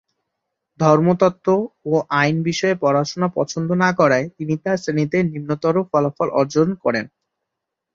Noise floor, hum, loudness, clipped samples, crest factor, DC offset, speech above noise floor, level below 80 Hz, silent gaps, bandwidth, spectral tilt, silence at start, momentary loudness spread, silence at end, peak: -81 dBFS; none; -19 LUFS; under 0.1%; 18 dB; under 0.1%; 63 dB; -60 dBFS; none; 7.6 kHz; -6.5 dB/octave; 0.8 s; 7 LU; 0.85 s; -2 dBFS